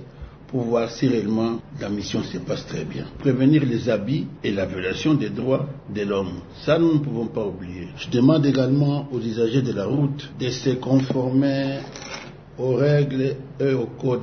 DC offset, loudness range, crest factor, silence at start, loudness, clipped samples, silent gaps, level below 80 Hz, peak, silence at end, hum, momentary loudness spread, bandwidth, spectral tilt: under 0.1%; 2 LU; 18 dB; 0 s; -23 LUFS; under 0.1%; none; -50 dBFS; -4 dBFS; 0 s; none; 12 LU; 6.6 kHz; -7.5 dB/octave